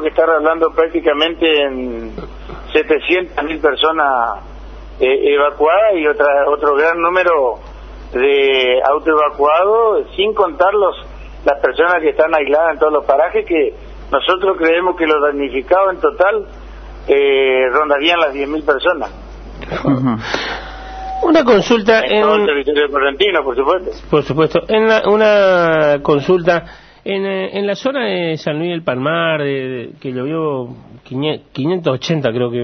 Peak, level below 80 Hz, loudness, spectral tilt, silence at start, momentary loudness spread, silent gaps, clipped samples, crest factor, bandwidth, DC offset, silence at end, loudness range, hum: 0 dBFS; -38 dBFS; -14 LUFS; -6 dB/octave; 0 s; 12 LU; none; under 0.1%; 14 dB; 6.6 kHz; under 0.1%; 0 s; 5 LU; none